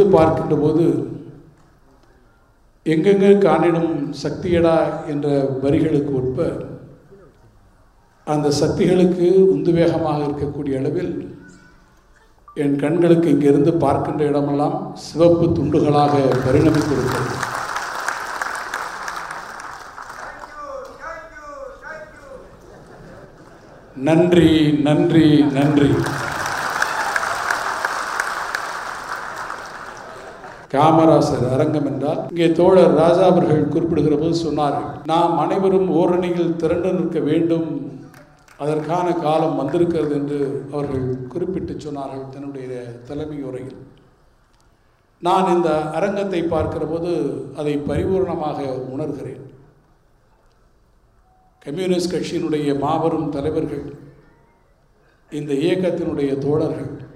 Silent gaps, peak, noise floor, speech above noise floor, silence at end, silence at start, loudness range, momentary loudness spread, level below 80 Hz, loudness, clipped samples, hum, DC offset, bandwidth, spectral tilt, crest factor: none; 0 dBFS; -57 dBFS; 40 dB; 0.05 s; 0 s; 12 LU; 18 LU; -48 dBFS; -18 LUFS; under 0.1%; none; under 0.1%; 15.5 kHz; -7 dB/octave; 18 dB